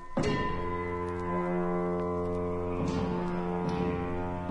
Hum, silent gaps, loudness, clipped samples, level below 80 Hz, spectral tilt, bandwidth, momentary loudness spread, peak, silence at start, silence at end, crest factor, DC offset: none; none; -32 LUFS; under 0.1%; -46 dBFS; -7.5 dB/octave; 10.5 kHz; 3 LU; -16 dBFS; 0 s; 0 s; 14 dB; under 0.1%